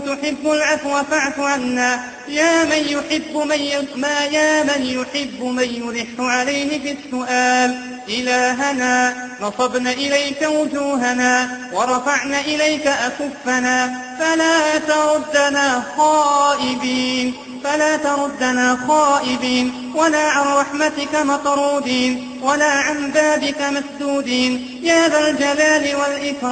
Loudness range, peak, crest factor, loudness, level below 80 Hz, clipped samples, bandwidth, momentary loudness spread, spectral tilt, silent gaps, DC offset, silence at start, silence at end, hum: 3 LU; -2 dBFS; 16 dB; -17 LUFS; -56 dBFS; under 0.1%; 9.2 kHz; 7 LU; -2 dB/octave; none; under 0.1%; 0 s; 0 s; none